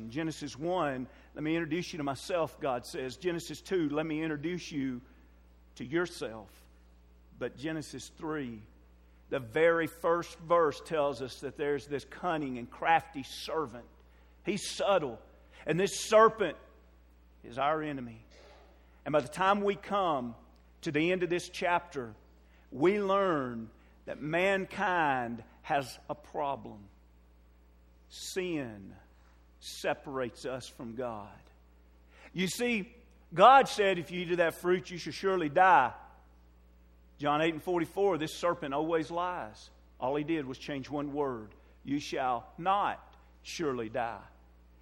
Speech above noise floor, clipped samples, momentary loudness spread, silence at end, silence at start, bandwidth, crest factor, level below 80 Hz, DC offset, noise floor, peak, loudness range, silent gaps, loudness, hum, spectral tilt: 29 dB; under 0.1%; 16 LU; 0.55 s; 0 s; 16 kHz; 24 dB; -60 dBFS; under 0.1%; -60 dBFS; -10 dBFS; 11 LU; none; -32 LUFS; none; -5 dB/octave